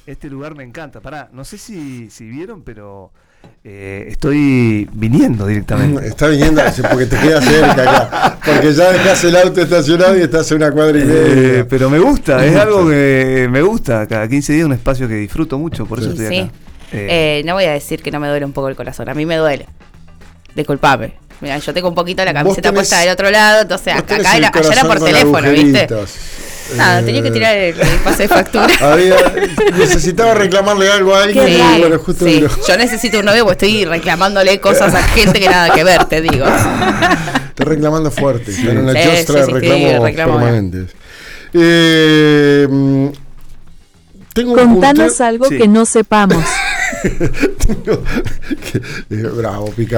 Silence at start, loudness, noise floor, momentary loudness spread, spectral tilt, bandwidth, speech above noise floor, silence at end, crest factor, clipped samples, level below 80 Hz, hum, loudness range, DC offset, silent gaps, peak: 0.1 s; -11 LUFS; -40 dBFS; 15 LU; -5 dB/octave; over 20 kHz; 30 dB; 0 s; 10 dB; under 0.1%; -26 dBFS; none; 8 LU; under 0.1%; none; -2 dBFS